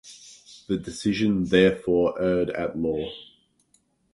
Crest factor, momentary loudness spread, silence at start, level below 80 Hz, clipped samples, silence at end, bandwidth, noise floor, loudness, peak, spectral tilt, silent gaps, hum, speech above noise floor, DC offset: 20 dB; 24 LU; 0.05 s; -52 dBFS; under 0.1%; 0.9 s; 11.5 kHz; -66 dBFS; -24 LUFS; -6 dBFS; -6 dB/octave; none; none; 43 dB; under 0.1%